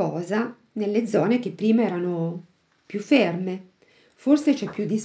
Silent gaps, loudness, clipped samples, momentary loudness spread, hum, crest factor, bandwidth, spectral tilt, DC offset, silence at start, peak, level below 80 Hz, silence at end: none; -24 LUFS; under 0.1%; 12 LU; none; 18 dB; 8 kHz; -6.5 dB/octave; under 0.1%; 0 s; -6 dBFS; -74 dBFS; 0 s